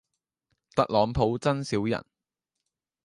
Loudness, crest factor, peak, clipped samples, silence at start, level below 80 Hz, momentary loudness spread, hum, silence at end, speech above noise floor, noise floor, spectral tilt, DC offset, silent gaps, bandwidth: -27 LUFS; 22 dB; -8 dBFS; under 0.1%; 0.75 s; -50 dBFS; 7 LU; none; 1.05 s; 61 dB; -86 dBFS; -6.5 dB/octave; under 0.1%; none; 11.5 kHz